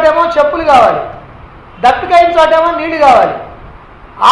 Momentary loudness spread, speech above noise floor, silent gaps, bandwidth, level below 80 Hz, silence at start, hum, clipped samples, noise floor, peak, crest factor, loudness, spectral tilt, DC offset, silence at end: 11 LU; 26 dB; none; 11 kHz; -38 dBFS; 0 s; none; 0.7%; -34 dBFS; 0 dBFS; 10 dB; -9 LUFS; -4.5 dB/octave; under 0.1%; 0 s